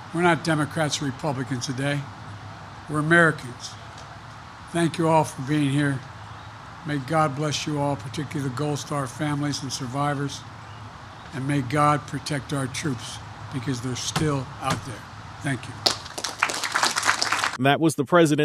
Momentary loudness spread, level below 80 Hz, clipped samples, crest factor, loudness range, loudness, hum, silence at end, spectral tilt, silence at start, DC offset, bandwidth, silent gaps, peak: 19 LU; -54 dBFS; under 0.1%; 26 dB; 5 LU; -24 LUFS; none; 0 s; -4.5 dB/octave; 0 s; under 0.1%; 15 kHz; none; 0 dBFS